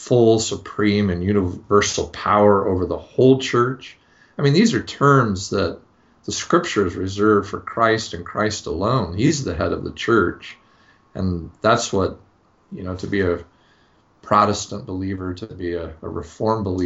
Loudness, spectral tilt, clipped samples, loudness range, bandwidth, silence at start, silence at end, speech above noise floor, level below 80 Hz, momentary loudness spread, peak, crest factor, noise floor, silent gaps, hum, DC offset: -20 LUFS; -5 dB/octave; under 0.1%; 6 LU; 8 kHz; 0 s; 0 s; 38 dB; -46 dBFS; 14 LU; -2 dBFS; 18 dB; -57 dBFS; none; none; under 0.1%